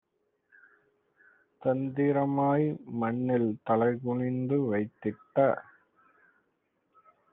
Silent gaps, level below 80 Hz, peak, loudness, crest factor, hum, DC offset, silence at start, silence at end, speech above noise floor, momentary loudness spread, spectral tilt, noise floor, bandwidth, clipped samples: none; -72 dBFS; -12 dBFS; -29 LUFS; 18 dB; none; under 0.1%; 1.6 s; 1.7 s; 48 dB; 6 LU; -8.5 dB/octave; -76 dBFS; 3.9 kHz; under 0.1%